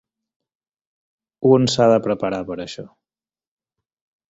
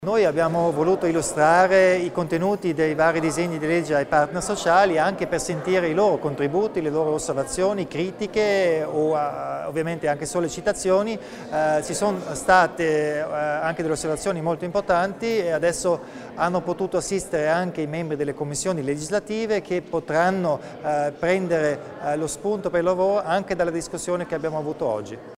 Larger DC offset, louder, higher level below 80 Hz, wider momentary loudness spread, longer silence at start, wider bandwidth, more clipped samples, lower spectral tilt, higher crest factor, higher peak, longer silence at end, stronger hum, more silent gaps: neither; first, -18 LUFS vs -23 LUFS; second, -58 dBFS vs -52 dBFS; first, 16 LU vs 8 LU; first, 1.4 s vs 0 s; second, 8 kHz vs 16 kHz; neither; about the same, -6 dB/octave vs -5 dB/octave; about the same, 20 dB vs 20 dB; about the same, -2 dBFS vs -2 dBFS; first, 1.45 s vs 0.05 s; neither; neither